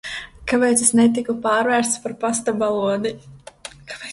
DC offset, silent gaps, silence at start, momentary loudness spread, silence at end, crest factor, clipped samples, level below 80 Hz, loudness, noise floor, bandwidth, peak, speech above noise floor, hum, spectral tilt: under 0.1%; none; 0.05 s; 21 LU; 0 s; 18 dB; under 0.1%; -52 dBFS; -19 LUFS; -40 dBFS; 11.5 kHz; -2 dBFS; 21 dB; none; -3 dB/octave